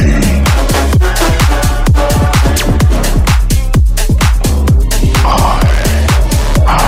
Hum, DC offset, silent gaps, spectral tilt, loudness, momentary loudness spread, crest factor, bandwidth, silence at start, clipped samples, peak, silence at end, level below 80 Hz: none; under 0.1%; none; -5 dB/octave; -11 LUFS; 2 LU; 8 dB; 16.5 kHz; 0 s; under 0.1%; -2 dBFS; 0 s; -10 dBFS